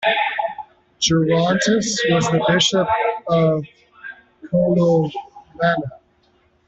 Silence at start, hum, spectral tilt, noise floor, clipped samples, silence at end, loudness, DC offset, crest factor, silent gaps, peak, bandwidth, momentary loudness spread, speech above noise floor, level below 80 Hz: 0 s; none; -4.5 dB/octave; -59 dBFS; under 0.1%; 0.7 s; -18 LUFS; under 0.1%; 16 dB; none; -4 dBFS; 8.2 kHz; 19 LU; 42 dB; -52 dBFS